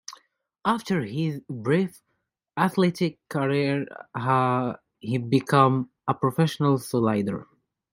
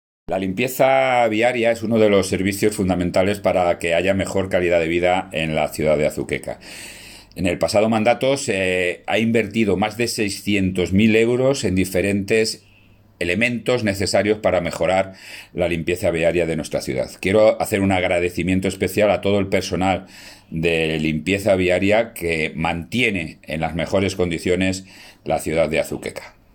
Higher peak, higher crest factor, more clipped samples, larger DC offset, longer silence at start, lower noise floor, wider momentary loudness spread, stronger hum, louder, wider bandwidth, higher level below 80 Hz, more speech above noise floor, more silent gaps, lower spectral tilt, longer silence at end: about the same, -4 dBFS vs -2 dBFS; about the same, 22 dB vs 18 dB; neither; neither; second, 0.1 s vs 0.3 s; first, -77 dBFS vs -51 dBFS; about the same, 10 LU vs 9 LU; neither; second, -25 LUFS vs -19 LUFS; about the same, 16 kHz vs 17.5 kHz; second, -66 dBFS vs -50 dBFS; first, 53 dB vs 32 dB; neither; first, -7 dB/octave vs -5 dB/octave; first, 0.5 s vs 0.25 s